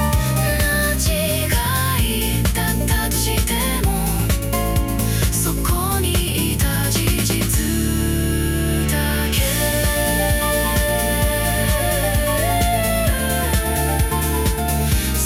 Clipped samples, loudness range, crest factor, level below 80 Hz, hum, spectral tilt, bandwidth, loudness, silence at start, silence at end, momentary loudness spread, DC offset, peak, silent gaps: under 0.1%; 1 LU; 14 dB; -24 dBFS; none; -4 dB/octave; 17.5 kHz; -19 LUFS; 0 s; 0 s; 2 LU; under 0.1%; -4 dBFS; none